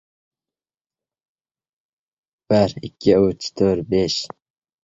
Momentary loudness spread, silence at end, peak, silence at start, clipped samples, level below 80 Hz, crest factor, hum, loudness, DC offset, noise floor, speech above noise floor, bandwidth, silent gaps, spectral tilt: 6 LU; 0.6 s; -2 dBFS; 2.5 s; under 0.1%; -50 dBFS; 20 dB; none; -19 LUFS; under 0.1%; under -90 dBFS; over 71 dB; 8 kHz; none; -6 dB/octave